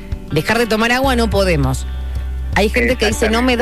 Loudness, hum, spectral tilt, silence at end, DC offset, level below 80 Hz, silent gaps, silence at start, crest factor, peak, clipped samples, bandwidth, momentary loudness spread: -16 LUFS; none; -5 dB/octave; 0 s; 1%; -24 dBFS; none; 0 s; 12 dB; -4 dBFS; under 0.1%; 14 kHz; 10 LU